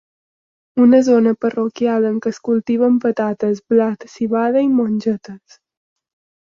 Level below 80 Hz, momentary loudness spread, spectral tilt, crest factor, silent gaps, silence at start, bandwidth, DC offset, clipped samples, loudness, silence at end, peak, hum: -64 dBFS; 10 LU; -7 dB/octave; 14 dB; none; 0.75 s; 7.4 kHz; under 0.1%; under 0.1%; -17 LUFS; 1.15 s; -2 dBFS; none